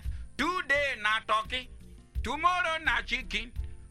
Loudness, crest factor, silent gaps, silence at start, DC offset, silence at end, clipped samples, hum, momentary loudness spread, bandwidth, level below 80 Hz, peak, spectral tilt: -29 LUFS; 18 dB; none; 0 s; under 0.1%; 0.05 s; under 0.1%; none; 14 LU; 14.5 kHz; -42 dBFS; -14 dBFS; -3.5 dB/octave